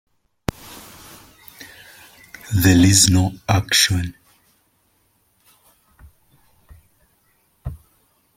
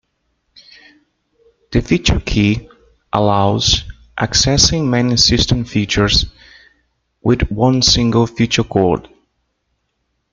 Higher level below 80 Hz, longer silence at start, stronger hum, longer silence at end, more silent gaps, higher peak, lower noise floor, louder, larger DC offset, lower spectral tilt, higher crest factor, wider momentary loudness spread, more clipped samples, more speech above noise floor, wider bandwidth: second, -44 dBFS vs -30 dBFS; second, 0.7 s vs 1.7 s; neither; second, 0.6 s vs 1.3 s; neither; about the same, 0 dBFS vs 0 dBFS; second, -63 dBFS vs -69 dBFS; about the same, -16 LUFS vs -14 LUFS; neither; about the same, -3.5 dB/octave vs -4 dB/octave; first, 22 dB vs 16 dB; first, 28 LU vs 10 LU; neither; second, 48 dB vs 55 dB; first, 16.5 kHz vs 9.4 kHz